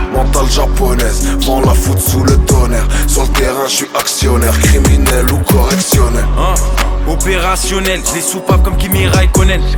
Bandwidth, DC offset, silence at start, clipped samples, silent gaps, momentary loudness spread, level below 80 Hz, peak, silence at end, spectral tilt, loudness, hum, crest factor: 19.5 kHz; under 0.1%; 0 s; under 0.1%; none; 4 LU; -12 dBFS; 0 dBFS; 0 s; -4.5 dB/octave; -12 LUFS; none; 10 dB